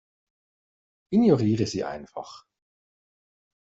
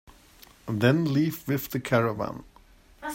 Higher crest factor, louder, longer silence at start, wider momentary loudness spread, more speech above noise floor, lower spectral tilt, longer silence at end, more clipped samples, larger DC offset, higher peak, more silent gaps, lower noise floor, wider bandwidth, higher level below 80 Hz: about the same, 20 dB vs 22 dB; about the same, -24 LUFS vs -26 LUFS; first, 1.1 s vs 0.65 s; first, 19 LU vs 16 LU; first, over 66 dB vs 30 dB; about the same, -7 dB/octave vs -6.5 dB/octave; first, 1.35 s vs 0 s; neither; neither; about the same, -8 dBFS vs -6 dBFS; neither; first, under -90 dBFS vs -55 dBFS; second, 8 kHz vs 16.5 kHz; second, -62 dBFS vs -56 dBFS